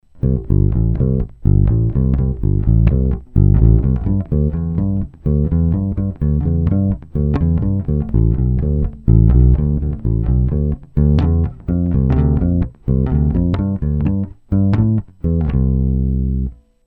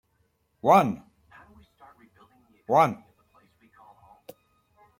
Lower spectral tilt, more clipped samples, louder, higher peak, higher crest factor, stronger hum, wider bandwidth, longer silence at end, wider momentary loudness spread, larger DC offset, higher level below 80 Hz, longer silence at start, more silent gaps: first, -12.5 dB/octave vs -6.5 dB/octave; neither; first, -17 LUFS vs -23 LUFS; first, 0 dBFS vs -6 dBFS; second, 14 dB vs 22 dB; neither; second, 4 kHz vs 16.5 kHz; second, 0.35 s vs 2.05 s; second, 6 LU vs 22 LU; neither; first, -20 dBFS vs -68 dBFS; second, 0.15 s vs 0.65 s; neither